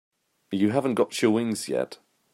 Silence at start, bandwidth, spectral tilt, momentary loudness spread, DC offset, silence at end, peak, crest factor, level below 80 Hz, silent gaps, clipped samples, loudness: 0.5 s; 16 kHz; -5.5 dB/octave; 8 LU; under 0.1%; 0.4 s; -8 dBFS; 18 dB; -72 dBFS; none; under 0.1%; -26 LUFS